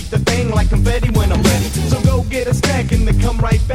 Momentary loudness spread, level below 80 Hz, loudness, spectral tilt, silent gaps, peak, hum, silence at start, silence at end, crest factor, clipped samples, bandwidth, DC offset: 3 LU; -18 dBFS; -16 LUFS; -5.5 dB/octave; none; 0 dBFS; none; 0 s; 0 s; 14 dB; under 0.1%; 16 kHz; under 0.1%